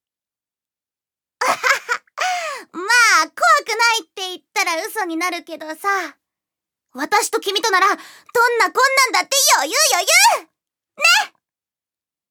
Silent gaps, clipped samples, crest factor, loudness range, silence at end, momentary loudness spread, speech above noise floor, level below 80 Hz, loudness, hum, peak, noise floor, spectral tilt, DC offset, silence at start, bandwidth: none; under 0.1%; 18 dB; 7 LU; 1.05 s; 14 LU; over 73 dB; -78 dBFS; -16 LUFS; none; -2 dBFS; under -90 dBFS; 2 dB/octave; under 0.1%; 1.4 s; over 20 kHz